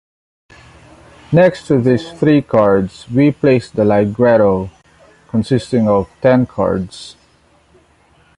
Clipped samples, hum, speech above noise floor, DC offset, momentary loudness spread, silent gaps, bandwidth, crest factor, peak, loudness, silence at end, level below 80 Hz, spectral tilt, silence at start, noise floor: under 0.1%; none; 39 dB; under 0.1%; 9 LU; none; 11 kHz; 14 dB; 0 dBFS; -14 LUFS; 1.25 s; -44 dBFS; -8 dB/octave; 1.3 s; -52 dBFS